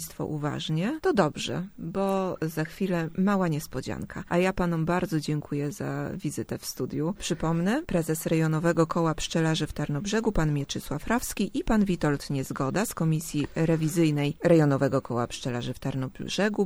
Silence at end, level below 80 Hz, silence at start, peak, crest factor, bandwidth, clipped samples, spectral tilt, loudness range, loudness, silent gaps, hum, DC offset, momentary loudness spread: 0 s; -46 dBFS; 0 s; -6 dBFS; 20 dB; over 20 kHz; under 0.1%; -6 dB/octave; 4 LU; -28 LUFS; none; none; under 0.1%; 8 LU